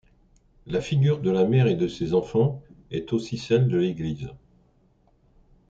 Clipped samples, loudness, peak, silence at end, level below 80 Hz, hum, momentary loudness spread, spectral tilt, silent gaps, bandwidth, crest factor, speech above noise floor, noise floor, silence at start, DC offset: under 0.1%; -24 LUFS; -10 dBFS; 1.35 s; -54 dBFS; none; 13 LU; -8 dB/octave; none; 7.8 kHz; 16 dB; 39 dB; -62 dBFS; 0.65 s; under 0.1%